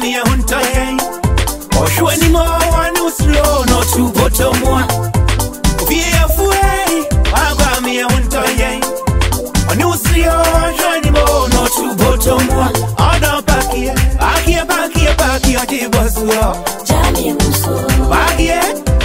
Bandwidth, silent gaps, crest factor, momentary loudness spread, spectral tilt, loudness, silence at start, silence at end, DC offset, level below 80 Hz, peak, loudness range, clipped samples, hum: 16.5 kHz; none; 12 dB; 4 LU; -4.5 dB/octave; -13 LUFS; 0 s; 0 s; 0.7%; -18 dBFS; 0 dBFS; 1 LU; under 0.1%; none